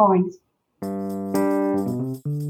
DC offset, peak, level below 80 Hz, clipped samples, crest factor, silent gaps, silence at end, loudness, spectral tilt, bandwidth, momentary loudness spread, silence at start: under 0.1%; -6 dBFS; -70 dBFS; under 0.1%; 18 dB; none; 0 s; -24 LUFS; -8.5 dB/octave; 18 kHz; 9 LU; 0 s